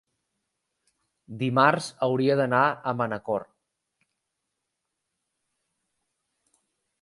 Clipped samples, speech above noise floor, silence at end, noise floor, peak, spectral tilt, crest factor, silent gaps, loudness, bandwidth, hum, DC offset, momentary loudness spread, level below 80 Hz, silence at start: under 0.1%; 58 dB; 3.6 s; -82 dBFS; -4 dBFS; -6 dB/octave; 24 dB; none; -24 LUFS; 11.5 kHz; none; under 0.1%; 10 LU; -72 dBFS; 1.3 s